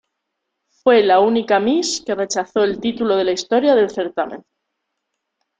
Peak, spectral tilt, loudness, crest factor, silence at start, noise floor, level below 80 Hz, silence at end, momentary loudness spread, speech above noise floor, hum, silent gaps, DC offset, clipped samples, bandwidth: -2 dBFS; -3.5 dB/octave; -17 LUFS; 16 dB; 0.85 s; -77 dBFS; -58 dBFS; 1.25 s; 9 LU; 60 dB; none; none; under 0.1%; under 0.1%; 9.4 kHz